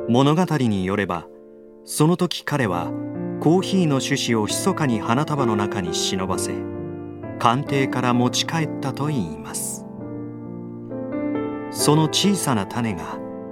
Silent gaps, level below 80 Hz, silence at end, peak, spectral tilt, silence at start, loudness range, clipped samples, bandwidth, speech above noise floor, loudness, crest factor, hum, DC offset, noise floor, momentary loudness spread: none; -56 dBFS; 0 s; 0 dBFS; -5 dB/octave; 0 s; 4 LU; under 0.1%; 16.5 kHz; 23 dB; -22 LUFS; 22 dB; none; under 0.1%; -44 dBFS; 14 LU